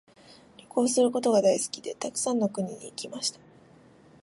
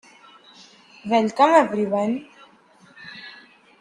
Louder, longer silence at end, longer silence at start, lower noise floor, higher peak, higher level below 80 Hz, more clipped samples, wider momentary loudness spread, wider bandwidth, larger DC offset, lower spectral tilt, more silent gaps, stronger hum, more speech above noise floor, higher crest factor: second, -27 LUFS vs -20 LUFS; first, 0.9 s vs 0.5 s; second, 0.75 s vs 1.05 s; about the same, -55 dBFS vs -53 dBFS; second, -10 dBFS vs -2 dBFS; about the same, -74 dBFS vs -70 dBFS; neither; second, 12 LU vs 24 LU; about the same, 11.5 kHz vs 10.5 kHz; neither; second, -4 dB/octave vs -5.5 dB/octave; neither; neither; second, 29 dB vs 35 dB; about the same, 18 dB vs 20 dB